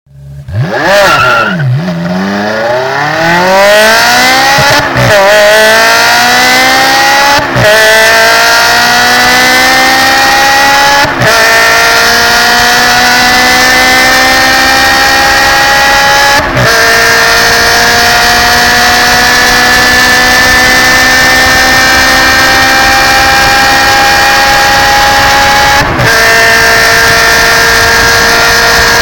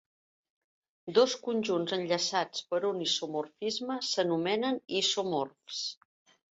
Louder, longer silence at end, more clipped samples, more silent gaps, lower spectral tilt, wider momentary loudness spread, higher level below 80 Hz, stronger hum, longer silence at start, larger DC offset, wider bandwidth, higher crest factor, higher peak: first, -3 LUFS vs -31 LUFS; second, 0 s vs 0.6 s; first, 1% vs under 0.1%; neither; about the same, -2 dB/octave vs -3 dB/octave; second, 3 LU vs 8 LU; first, -26 dBFS vs -78 dBFS; neither; second, 0.2 s vs 1.05 s; neither; first, over 20 kHz vs 8.2 kHz; second, 4 dB vs 20 dB; first, 0 dBFS vs -12 dBFS